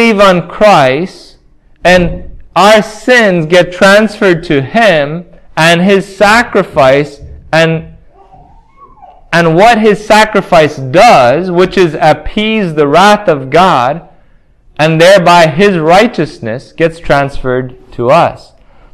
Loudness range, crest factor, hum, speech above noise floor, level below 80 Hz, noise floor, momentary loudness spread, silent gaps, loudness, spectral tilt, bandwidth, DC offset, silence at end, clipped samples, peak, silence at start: 3 LU; 8 dB; none; 36 dB; -34 dBFS; -43 dBFS; 10 LU; none; -7 LUFS; -5 dB/octave; 16 kHz; under 0.1%; 0.55 s; 4%; 0 dBFS; 0 s